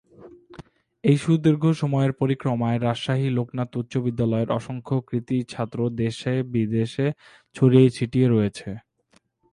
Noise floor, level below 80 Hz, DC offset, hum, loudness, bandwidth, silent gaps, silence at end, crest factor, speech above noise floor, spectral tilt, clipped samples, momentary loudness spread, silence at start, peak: -63 dBFS; -56 dBFS; under 0.1%; none; -23 LUFS; 11 kHz; none; 0.75 s; 20 dB; 41 dB; -8 dB/octave; under 0.1%; 9 LU; 0.2 s; -4 dBFS